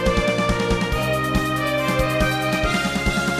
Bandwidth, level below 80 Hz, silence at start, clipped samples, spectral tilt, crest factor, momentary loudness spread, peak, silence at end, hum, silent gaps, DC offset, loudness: 15.5 kHz; -30 dBFS; 0 s; under 0.1%; -5 dB/octave; 16 dB; 2 LU; -6 dBFS; 0 s; none; none; 0.2%; -21 LUFS